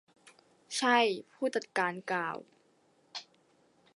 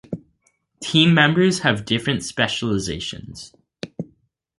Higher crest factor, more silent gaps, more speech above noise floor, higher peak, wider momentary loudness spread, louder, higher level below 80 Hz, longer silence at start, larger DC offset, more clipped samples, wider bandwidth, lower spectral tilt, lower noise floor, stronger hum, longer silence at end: about the same, 22 dB vs 20 dB; neither; second, 37 dB vs 47 dB; second, -12 dBFS vs -2 dBFS; second, 19 LU vs 22 LU; second, -31 LUFS vs -19 LUFS; second, -86 dBFS vs -50 dBFS; first, 0.25 s vs 0.1 s; neither; neither; about the same, 11.5 kHz vs 11.5 kHz; second, -3 dB/octave vs -4.5 dB/octave; about the same, -69 dBFS vs -66 dBFS; neither; first, 0.75 s vs 0.55 s